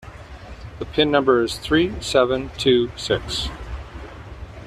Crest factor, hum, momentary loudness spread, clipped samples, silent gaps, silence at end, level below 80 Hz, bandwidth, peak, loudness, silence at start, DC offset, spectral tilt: 18 dB; none; 21 LU; under 0.1%; none; 0 s; -38 dBFS; 13.5 kHz; -4 dBFS; -20 LUFS; 0 s; under 0.1%; -5 dB/octave